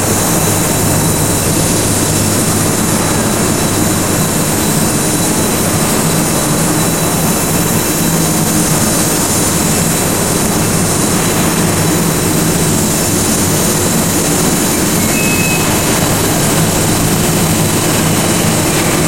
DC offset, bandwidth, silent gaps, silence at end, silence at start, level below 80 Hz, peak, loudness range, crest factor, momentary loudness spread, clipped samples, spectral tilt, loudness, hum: 2%; 16.5 kHz; none; 0 s; 0 s; -32 dBFS; 0 dBFS; 1 LU; 12 dB; 1 LU; under 0.1%; -3.5 dB/octave; -11 LUFS; none